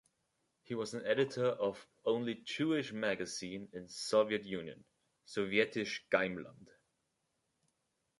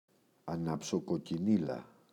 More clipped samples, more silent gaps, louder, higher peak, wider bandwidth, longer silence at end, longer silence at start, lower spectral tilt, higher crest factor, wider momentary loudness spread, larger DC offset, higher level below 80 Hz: neither; neither; about the same, -36 LUFS vs -35 LUFS; about the same, -16 dBFS vs -18 dBFS; about the same, 11.5 kHz vs 12 kHz; first, 1.55 s vs 0.25 s; first, 0.7 s vs 0.45 s; second, -4.5 dB/octave vs -6.5 dB/octave; about the same, 22 dB vs 18 dB; about the same, 12 LU vs 11 LU; neither; second, -76 dBFS vs -68 dBFS